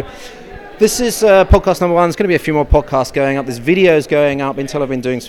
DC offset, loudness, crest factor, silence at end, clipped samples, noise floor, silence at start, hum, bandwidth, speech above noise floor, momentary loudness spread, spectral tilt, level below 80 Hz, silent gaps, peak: under 0.1%; -13 LUFS; 14 dB; 0 s; under 0.1%; -33 dBFS; 0 s; none; 17.5 kHz; 20 dB; 11 LU; -5.5 dB/octave; -24 dBFS; none; 0 dBFS